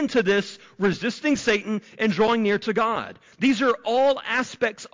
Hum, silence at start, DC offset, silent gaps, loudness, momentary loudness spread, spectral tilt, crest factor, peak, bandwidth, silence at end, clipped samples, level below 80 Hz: none; 0 s; under 0.1%; none; -23 LUFS; 6 LU; -5 dB/octave; 12 dB; -12 dBFS; 7.6 kHz; 0.05 s; under 0.1%; -58 dBFS